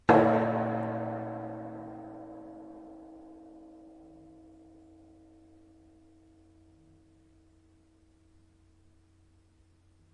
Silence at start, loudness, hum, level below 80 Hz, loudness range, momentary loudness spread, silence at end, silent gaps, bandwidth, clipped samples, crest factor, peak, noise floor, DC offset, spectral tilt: 0.1 s; -31 LUFS; none; -64 dBFS; 26 LU; 29 LU; 6.25 s; none; 9.4 kHz; under 0.1%; 28 dB; -8 dBFS; -64 dBFS; under 0.1%; -8.5 dB/octave